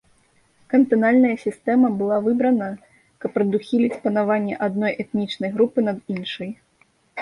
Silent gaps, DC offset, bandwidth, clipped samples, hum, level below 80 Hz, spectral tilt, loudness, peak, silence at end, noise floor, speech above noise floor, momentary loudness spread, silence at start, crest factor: none; under 0.1%; 11 kHz; under 0.1%; none; -64 dBFS; -7.5 dB/octave; -21 LUFS; -6 dBFS; 0 s; -61 dBFS; 41 dB; 15 LU; 0.7 s; 16 dB